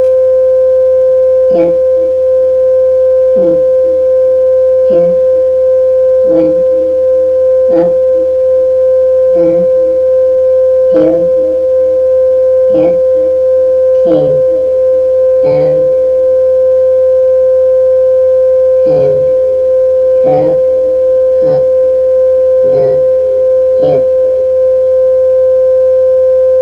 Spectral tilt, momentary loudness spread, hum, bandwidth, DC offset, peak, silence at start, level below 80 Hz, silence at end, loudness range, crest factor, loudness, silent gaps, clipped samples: -8.5 dB/octave; 2 LU; none; 3.4 kHz; under 0.1%; 0 dBFS; 0 s; -40 dBFS; 0 s; 1 LU; 8 dB; -8 LUFS; none; under 0.1%